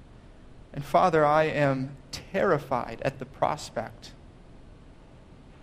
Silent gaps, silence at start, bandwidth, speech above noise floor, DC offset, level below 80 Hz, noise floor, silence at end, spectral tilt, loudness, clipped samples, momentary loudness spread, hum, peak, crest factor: none; 0 s; 15.5 kHz; 24 dB; under 0.1%; -52 dBFS; -50 dBFS; 0.15 s; -6 dB/octave; -26 LUFS; under 0.1%; 19 LU; none; -8 dBFS; 20 dB